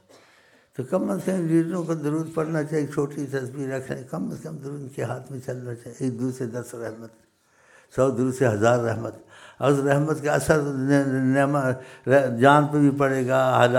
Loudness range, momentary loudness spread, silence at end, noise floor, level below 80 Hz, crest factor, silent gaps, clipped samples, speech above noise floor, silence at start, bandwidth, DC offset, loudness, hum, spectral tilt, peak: 11 LU; 14 LU; 0 s; -59 dBFS; -58 dBFS; 20 dB; none; under 0.1%; 36 dB; 0.8 s; 16 kHz; under 0.1%; -23 LUFS; none; -6.5 dB/octave; -2 dBFS